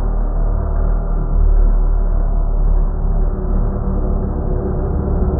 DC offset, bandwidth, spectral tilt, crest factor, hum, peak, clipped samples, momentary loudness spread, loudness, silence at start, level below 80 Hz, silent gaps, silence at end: under 0.1%; 1.8 kHz; -15.5 dB/octave; 10 dB; none; -4 dBFS; under 0.1%; 3 LU; -20 LUFS; 0 s; -14 dBFS; none; 0 s